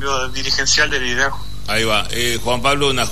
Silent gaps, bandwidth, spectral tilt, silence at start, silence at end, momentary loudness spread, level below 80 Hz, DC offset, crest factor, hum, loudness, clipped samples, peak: none; 13.5 kHz; -2 dB/octave; 0 s; 0 s; 7 LU; -34 dBFS; 7%; 14 dB; 50 Hz at -35 dBFS; -17 LUFS; under 0.1%; -4 dBFS